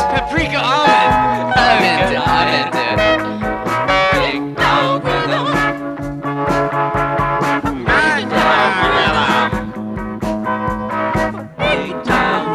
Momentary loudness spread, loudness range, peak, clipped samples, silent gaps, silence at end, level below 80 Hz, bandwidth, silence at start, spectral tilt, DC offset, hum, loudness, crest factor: 9 LU; 4 LU; -2 dBFS; under 0.1%; none; 0 s; -34 dBFS; 14 kHz; 0 s; -5 dB/octave; under 0.1%; none; -15 LUFS; 14 dB